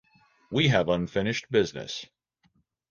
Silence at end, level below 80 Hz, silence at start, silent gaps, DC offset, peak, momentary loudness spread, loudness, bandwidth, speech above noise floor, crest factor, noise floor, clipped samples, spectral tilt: 0.85 s; -56 dBFS; 0.5 s; none; under 0.1%; -8 dBFS; 13 LU; -27 LUFS; 7.4 kHz; 43 dB; 20 dB; -69 dBFS; under 0.1%; -5.5 dB/octave